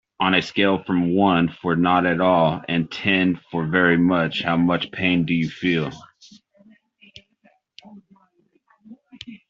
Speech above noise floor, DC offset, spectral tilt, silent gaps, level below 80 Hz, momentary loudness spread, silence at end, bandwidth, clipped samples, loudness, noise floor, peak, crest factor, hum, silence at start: 43 dB; under 0.1%; -7 dB/octave; none; -58 dBFS; 6 LU; 0.15 s; 7.4 kHz; under 0.1%; -20 LUFS; -63 dBFS; -2 dBFS; 18 dB; none; 0.2 s